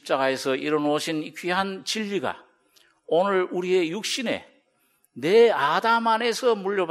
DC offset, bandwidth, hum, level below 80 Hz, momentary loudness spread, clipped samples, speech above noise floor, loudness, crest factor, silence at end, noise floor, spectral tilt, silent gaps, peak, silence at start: under 0.1%; 15.5 kHz; none; -74 dBFS; 10 LU; under 0.1%; 44 dB; -23 LUFS; 18 dB; 0 s; -67 dBFS; -4 dB/octave; none; -6 dBFS; 0.05 s